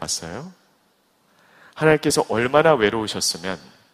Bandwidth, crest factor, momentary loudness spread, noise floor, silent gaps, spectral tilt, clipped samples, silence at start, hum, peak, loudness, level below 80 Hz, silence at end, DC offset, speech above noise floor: 15.5 kHz; 22 dB; 17 LU; -63 dBFS; none; -3.5 dB/octave; under 0.1%; 0 s; none; 0 dBFS; -20 LUFS; -54 dBFS; 0.35 s; under 0.1%; 42 dB